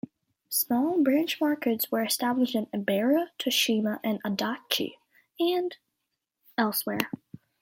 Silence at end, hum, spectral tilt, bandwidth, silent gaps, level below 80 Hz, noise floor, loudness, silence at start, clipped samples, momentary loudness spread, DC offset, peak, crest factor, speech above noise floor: 0.5 s; none; -3.5 dB/octave; 17 kHz; none; -74 dBFS; -83 dBFS; -27 LUFS; 0.5 s; under 0.1%; 7 LU; under 0.1%; -6 dBFS; 22 dB; 56 dB